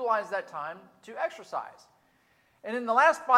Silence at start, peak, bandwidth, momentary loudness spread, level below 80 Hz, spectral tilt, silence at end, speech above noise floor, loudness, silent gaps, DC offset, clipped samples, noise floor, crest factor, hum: 0 s; -8 dBFS; 13.5 kHz; 22 LU; -84 dBFS; -3 dB/octave; 0 s; 39 dB; -29 LUFS; none; under 0.1%; under 0.1%; -67 dBFS; 22 dB; none